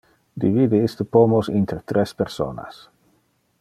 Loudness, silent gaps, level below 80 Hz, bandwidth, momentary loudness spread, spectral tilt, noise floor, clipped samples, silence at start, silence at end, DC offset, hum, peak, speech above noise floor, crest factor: -20 LUFS; none; -54 dBFS; 14 kHz; 15 LU; -8 dB/octave; -65 dBFS; under 0.1%; 0.35 s; 0.9 s; under 0.1%; none; -2 dBFS; 45 dB; 20 dB